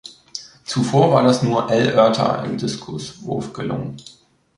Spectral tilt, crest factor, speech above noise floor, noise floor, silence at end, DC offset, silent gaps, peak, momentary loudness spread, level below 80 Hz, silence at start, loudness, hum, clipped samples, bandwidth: -6 dB/octave; 18 dB; 20 dB; -38 dBFS; 0.55 s; under 0.1%; none; -2 dBFS; 18 LU; -54 dBFS; 0.05 s; -18 LUFS; none; under 0.1%; 11.5 kHz